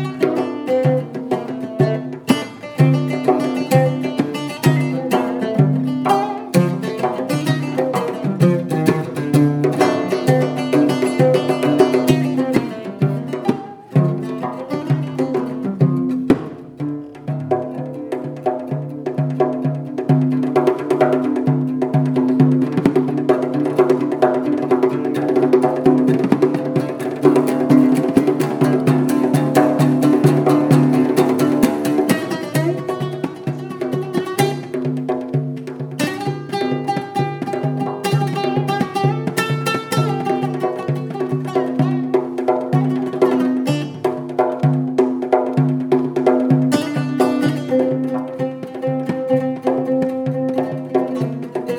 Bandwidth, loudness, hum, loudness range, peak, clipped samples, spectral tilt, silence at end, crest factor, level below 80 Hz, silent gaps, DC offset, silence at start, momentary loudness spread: 18.5 kHz; -18 LUFS; none; 6 LU; 0 dBFS; under 0.1%; -7.5 dB/octave; 0 s; 18 dB; -58 dBFS; none; under 0.1%; 0 s; 8 LU